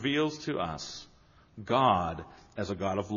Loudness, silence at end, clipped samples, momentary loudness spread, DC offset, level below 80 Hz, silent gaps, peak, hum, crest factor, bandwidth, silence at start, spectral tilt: -31 LUFS; 0 s; under 0.1%; 19 LU; under 0.1%; -58 dBFS; none; -12 dBFS; none; 20 dB; 7.2 kHz; 0 s; -4 dB/octave